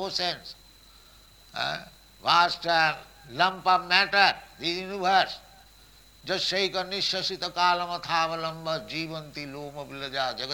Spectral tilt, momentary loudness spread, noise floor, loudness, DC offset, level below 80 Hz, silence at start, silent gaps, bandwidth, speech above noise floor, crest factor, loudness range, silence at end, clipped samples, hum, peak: -3 dB/octave; 16 LU; -54 dBFS; -26 LUFS; under 0.1%; -60 dBFS; 0 s; none; 19.5 kHz; 27 dB; 22 dB; 4 LU; 0 s; under 0.1%; none; -6 dBFS